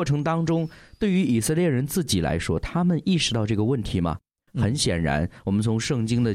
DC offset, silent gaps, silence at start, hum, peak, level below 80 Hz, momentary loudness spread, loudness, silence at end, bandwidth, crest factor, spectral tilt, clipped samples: under 0.1%; none; 0 s; none; -10 dBFS; -44 dBFS; 5 LU; -24 LUFS; 0 s; 16 kHz; 12 dB; -5.5 dB/octave; under 0.1%